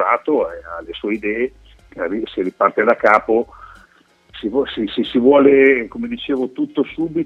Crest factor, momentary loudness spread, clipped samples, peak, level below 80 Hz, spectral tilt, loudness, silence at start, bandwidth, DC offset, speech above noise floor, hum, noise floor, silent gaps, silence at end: 18 dB; 14 LU; under 0.1%; 0 dBFS; -50 dBFS; -7 dB/octave; -17 LUFS; 0 s; 6.2 kHz; under 0.1%; 36 dB; none; -53 dBFS; none; 0 s